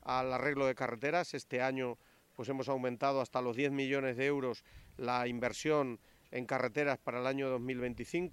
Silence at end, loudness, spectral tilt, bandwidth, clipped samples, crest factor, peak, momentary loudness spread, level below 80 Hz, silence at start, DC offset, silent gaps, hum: 0 s; -36 LUFS; -5.5 dB/octave; 16 kHz; under 0.1%; 18 dB; -18 dBFS; 8 LU; -66 dBFS; 0.05 s; under 0.1%; none; none